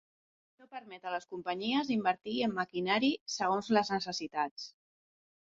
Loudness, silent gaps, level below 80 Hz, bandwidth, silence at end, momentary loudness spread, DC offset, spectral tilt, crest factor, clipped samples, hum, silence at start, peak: -33 LUFS; 3.21-3.26 s, 4.51-4.56 s; -76 dBFS; 7.6 kHz; 0.85 s; 16 LU; under 0.1%; -2.5 dB/octave; 20 dB; under 0.1%; none; 0.6 s; -14 dBFS